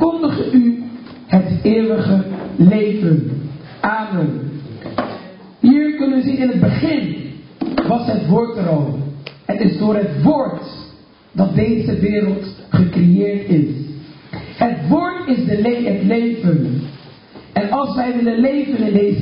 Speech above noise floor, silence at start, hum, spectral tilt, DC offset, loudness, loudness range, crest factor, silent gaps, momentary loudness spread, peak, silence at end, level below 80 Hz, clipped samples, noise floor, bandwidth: 28 dB; 0 s; none; -13 dB/octave; under 0.1%; -16 LUFS; 2 LU; 16 dB; none; 15 LU; 0 dBFS; 0 s; -44 dBFS; under 0.1%; -43 dBFS; 5.4 kHz